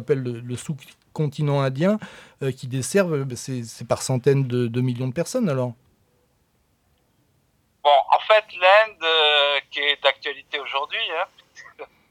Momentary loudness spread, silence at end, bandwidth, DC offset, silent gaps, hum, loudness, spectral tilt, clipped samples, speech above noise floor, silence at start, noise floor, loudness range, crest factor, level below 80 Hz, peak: 15 LU; 0.25 s; 15 kHz; under 0.1%; none; none; -21 LUFS; -4.5 dB/octave; under 0.1%; 44 dB; 0 s; -66 dBFS; 7 LU; 22 dB; -66 dBFS; -2 dBFS